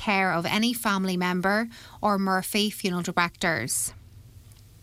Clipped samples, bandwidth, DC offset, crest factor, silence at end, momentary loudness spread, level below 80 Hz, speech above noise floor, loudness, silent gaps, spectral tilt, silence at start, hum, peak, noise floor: under 0.1%; 16 kHz; under 0.1%; 18 dB; 0.3 s; 4 LU; -56 dBFS; 24 dB; -25 LUFS; none; -3.5 dB/octave; 0 s; none; -8 dBFS; -50 dBFS